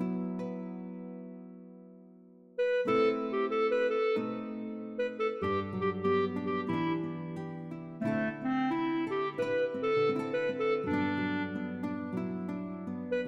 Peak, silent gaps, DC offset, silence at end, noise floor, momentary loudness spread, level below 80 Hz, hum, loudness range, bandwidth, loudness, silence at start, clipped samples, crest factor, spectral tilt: -18 dBFS; none; under 0.1%; 0 s; -56 dBFS; 13 LU; -72 dBFS; none; 2 LU; 8 kHz; -33 LUFS; 0 s; under 0.1%; 16 dB; -8 dB/octave